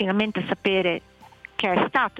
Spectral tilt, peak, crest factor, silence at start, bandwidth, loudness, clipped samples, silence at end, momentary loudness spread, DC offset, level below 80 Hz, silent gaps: -6.5 dB/octave; -8 dBFS; 16 dB; 0 s; 8.4 kHz; -24 LUFS; under 0.1%; 0 s; 8 LU; under 0.1%; -58 dBFS; none